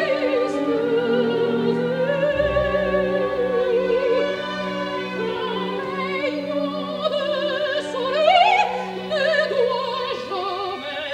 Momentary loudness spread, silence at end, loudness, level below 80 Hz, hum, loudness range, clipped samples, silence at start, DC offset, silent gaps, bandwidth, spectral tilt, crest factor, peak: 7 LU; 0 s; -22 LUFS; -48 dBFS; none; 4 LU; under 0.1%; 0 s; under 0.1%; none; 11 kHz; -5.5 dB/octave; 18 dB; -4 dBFS